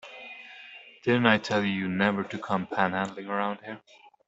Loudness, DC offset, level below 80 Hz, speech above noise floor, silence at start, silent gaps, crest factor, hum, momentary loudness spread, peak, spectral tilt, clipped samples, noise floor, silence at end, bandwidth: -27 LUFS; under 0.1%; -68 dBFS; 21 dB; 0.05 s; none; 24 dB; none; 20 LU; -4 dBFS; -6 dB/octave; under 0.1%; -48 dBFS; 0.5 s; 8 kHz